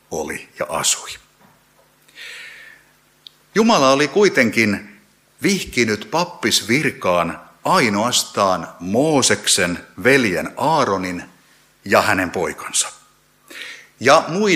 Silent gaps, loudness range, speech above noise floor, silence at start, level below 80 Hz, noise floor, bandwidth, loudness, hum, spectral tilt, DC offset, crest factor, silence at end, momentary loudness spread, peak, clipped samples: none; 5 LU; 38 dB; 0.1 s; -54 dBFS; -55 dBFS; 16 kHz; -17 LUFS; none; -3 dB/octave; under 0.1%; 20 dB; 0 s; 19 LU; 0 dBFS; under 0.1%